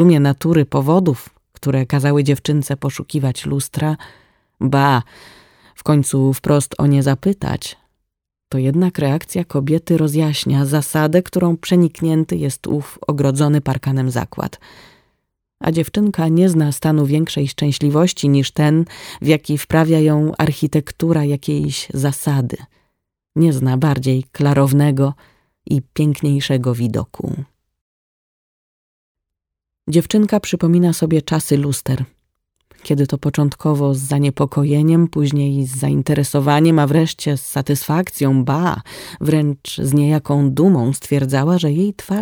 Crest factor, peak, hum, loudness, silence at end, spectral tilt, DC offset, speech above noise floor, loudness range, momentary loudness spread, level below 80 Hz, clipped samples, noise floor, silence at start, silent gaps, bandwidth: 16 dB; -2 dBFS; none; -17 LUFS; 0 s; -6.5 dB/octave; under 0.1%; 67 dB; 4 LU; 8 LU; -48 dBFS; under 0.1%; -83 dBFS; 0 s; 27.81-29.15 s; 19 kHz